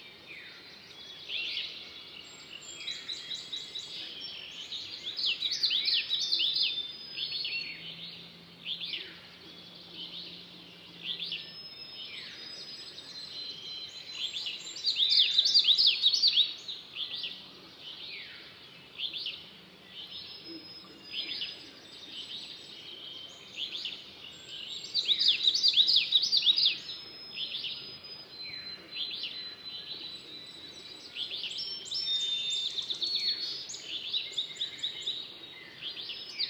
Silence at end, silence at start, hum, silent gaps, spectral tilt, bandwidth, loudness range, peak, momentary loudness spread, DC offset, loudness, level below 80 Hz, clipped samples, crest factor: 0 s; 0 s; none; none; 0.5 dB/octave; over 20 kHz; 15 LU; -12 dBFS; 22 LU; under 0.1%; -29 LUFS; -78 dBFS; under 0.1%; 24 dB